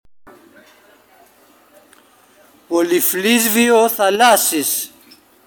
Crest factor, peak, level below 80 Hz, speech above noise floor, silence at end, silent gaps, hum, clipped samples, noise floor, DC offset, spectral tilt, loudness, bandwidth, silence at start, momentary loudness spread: 18 dB; 0 dBFS; -68 dBFS; 36 dB; 0.6 s; none; none; under 0.1%; -51 dBFS; under 0.1%; -2 dB/octave; -14 LUFS; over 20 kHz; 2.7 s; 9 LU